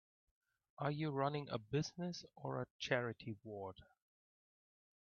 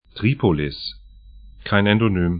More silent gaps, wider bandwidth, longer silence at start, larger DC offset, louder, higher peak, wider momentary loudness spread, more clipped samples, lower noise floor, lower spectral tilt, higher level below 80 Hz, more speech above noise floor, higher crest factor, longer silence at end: first, 2.71-2.79 s vs none; first, 7 kHz vs 5.2 kHz; first, 0.8 s vs 0.15 s; neither; second, -43 LUFS vs -20 LUFS; second, -22 dBFS vs 0 dBFS; second, 11 LU vs 14 LU; neither; first, under -90 dBFS vs -43 dBFS; second, -5 dB/octave vs -11.5 dB/octave; second, -76 dBFS vs -40 dBFS; first, over 47 dB vs 25 dB; about the same, 22 dB vs 20 dB; first, 1.2 s vs 0 s